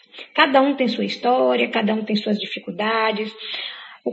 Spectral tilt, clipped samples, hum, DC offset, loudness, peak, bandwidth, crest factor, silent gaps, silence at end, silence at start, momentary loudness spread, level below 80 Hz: -6 dB/octave; under 0.1%; none; under 0.1%; -20 LUFS; -2 dBFS; 8 kHz; 20 dB; none; 0 s; 0.15 s; 12 LU; -76 dBFS